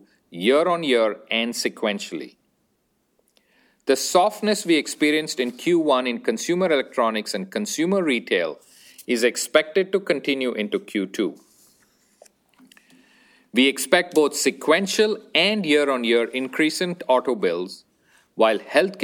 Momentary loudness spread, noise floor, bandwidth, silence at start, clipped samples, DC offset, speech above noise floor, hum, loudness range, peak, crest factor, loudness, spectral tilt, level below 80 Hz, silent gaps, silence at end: 9 LU; -69 dBFS; 19.5 kHz; 0.3 s; under 0.1%; under 0.1%; 48 dB; none; 6 LU; -2 dBFS; 22 dB; -21 LUFS; -3.5 dB/octave; -72 dBFS; none; 0 s